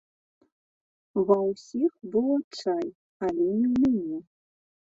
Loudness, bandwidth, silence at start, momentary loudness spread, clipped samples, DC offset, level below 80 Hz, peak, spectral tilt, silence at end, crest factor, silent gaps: -27 LUFS; 7.8 kHz; 1.15 s; 10 LU; under 0.1%; under 0.1%; -64 dBFS; -8 dBFS; -7.5 dB/octave; 0.75 s; 18 dB; 2.44-2.51 s, 2.95-3.20 s